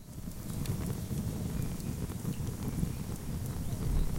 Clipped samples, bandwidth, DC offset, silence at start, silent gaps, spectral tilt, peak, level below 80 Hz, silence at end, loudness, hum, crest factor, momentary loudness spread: under 0.1%; 17 kHz; under 0.1%; 0 s; none; -6.5 dB/octave; -18 dBFS; -40 dBFS; 0 s; -37 LUFS; none; 16 dB; 3 LU